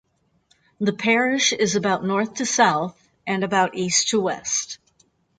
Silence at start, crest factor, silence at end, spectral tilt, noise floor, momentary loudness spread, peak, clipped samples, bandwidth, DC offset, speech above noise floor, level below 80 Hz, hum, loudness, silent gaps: 0.8 s; 18 dB; 0.65 s; -2.5 dB/octave; -64 dBFS; 9 LU; -4 dBFS; under 0.1%; 10 kHz; under 0.1%; 42 dB; -64 dBFS; none; -21 LUFS; none